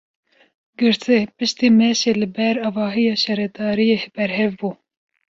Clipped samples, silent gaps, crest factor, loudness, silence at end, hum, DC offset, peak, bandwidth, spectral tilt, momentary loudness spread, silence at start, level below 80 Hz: under 0.1%; none; 16 dB; -19 LUFS; 0.55 s; none; under 0.1%; -4 dBFS; 7.6 kHz; -4.5 dB/octave; 8 LU; 0.8 s; -60 dBFS